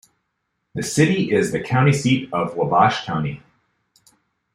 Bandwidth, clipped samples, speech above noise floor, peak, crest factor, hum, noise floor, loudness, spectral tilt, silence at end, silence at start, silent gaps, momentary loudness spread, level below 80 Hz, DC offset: 15 kHz; under 0.1%; 56 dB; -2 dBFS; 20 dB; none; -75 dBFS; -19 LUFS; -5.5 dB/octave; 1.15 s; 0.75 s; none; 12 LU; -56 dBFS; under 0.1%